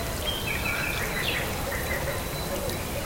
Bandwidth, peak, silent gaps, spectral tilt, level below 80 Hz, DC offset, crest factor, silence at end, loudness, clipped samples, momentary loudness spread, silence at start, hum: 17 kHz; -14 dBFS; none; -3.5 dB/octave; -38 dBFS; 0.2%; 16 dB; 0 s; -28 LUFS; under 0.1%; 4 LU; 0 s; none